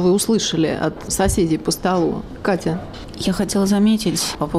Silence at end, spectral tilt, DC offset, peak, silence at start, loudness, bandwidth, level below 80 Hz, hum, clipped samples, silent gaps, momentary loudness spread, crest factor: 0 s; -4.5 dB/octave; under 0.1%; -8 dBFS; 0 s; -19 LUFS; 15.5 kHz; -36 dBFS; none; under 0.1%; none; 8 LU; 10 dB